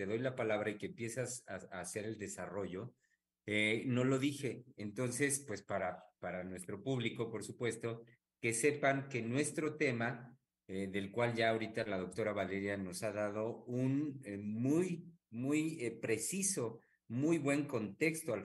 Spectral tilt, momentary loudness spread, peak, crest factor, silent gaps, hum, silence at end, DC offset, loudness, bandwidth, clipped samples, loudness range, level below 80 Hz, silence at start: -5 dB/octave; 11 LU; -20 dBFS; 20 dB; none; none; 0 s; under 0.1%; -38 LUFS; 13 kHz; under 0.1%; 3 LU; -80 dBFS; 0 s